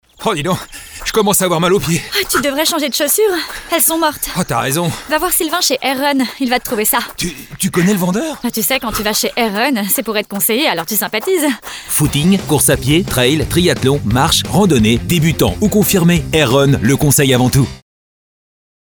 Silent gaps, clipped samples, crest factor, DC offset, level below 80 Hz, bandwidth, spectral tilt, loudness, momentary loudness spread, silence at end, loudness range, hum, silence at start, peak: none; under 0.1%; 14 dB; under 0.1%; -34 dBFS; over 20 kHz; -4 dB/octave; -14 LUFS; 7 LU; 1.05 s; 3 LU; none; 0.2 s; 0 dBFS